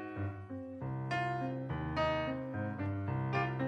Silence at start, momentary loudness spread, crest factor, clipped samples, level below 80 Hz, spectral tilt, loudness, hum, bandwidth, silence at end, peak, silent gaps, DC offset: 0 s; 8 LU; 16 dB; under 0.1%; -56 dBFS; -8 dB/octave; -37 LUFS; none; 8.2 kHz; 0 s; -22 dBFS; none; under 0.1%